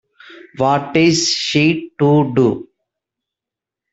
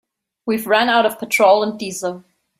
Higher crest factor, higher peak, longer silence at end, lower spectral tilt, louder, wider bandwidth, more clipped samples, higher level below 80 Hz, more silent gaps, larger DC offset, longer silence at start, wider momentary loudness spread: about the same, 18 dB vs 16 dB; about the same, 0 dBFS vs -2 dBFS; first, 1.3 s vs 0.4 s; first, -5 dB/octave vs -3 dB/octave; about the same, -15 LUFS vs -17 LUFS; second, 8 kHz vs 16 kHz; neither; first, -56 dBFS vs -64 dBFS; neither; neither; second, 0.3 s vs 0.45 s; second, 5 LU vs 14 LU